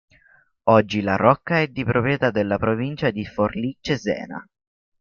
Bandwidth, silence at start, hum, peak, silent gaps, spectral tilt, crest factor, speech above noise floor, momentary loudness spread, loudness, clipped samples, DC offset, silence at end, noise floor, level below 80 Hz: 7.2 kHz; 0.65 s; none; -2 dBFS; none; -7 dB/octave; 20 dB; 37 dB; 9 LU; -21 LUFS; under 0.1%; under 0.1%; 0.6 s; -58 dBFS; -52 dBFS